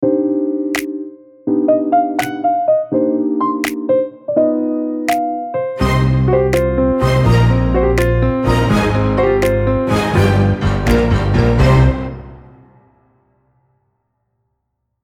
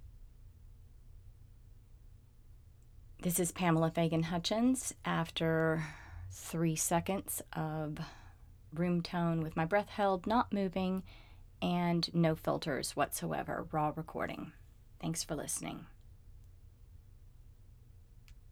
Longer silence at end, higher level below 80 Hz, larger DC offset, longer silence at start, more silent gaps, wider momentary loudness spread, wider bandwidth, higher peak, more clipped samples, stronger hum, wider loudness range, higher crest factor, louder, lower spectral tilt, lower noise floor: first, 2.65 s vs 0 s; first, -26 dBFS vs -56 dBFS; neither; about the same, 0 s vs 0 s; neither; second, 7 LU vs 12 LU; about the same, 18 kHz vs 19 kHz; first, 0 dBFS vs -18 dBFS; neither; neither; second, 3 LU vs 9 LU; about the same, 14 dB vs 18 dB; first, -15 LUFS vs -35 LUFS; first, -7.5 dB/octave vs -5 dB/octave; first, -71 dBFS vs -58 dBFS